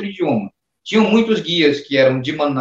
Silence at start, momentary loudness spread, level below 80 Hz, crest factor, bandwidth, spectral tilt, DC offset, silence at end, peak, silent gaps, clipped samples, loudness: 0 s; 8 LU; -60 dBFS; 16 dB; 7.6 kHz; -6 dB/octave; under 0.1%; 0 s; -2 dBFS; none; under 0.1%; -16 LUFS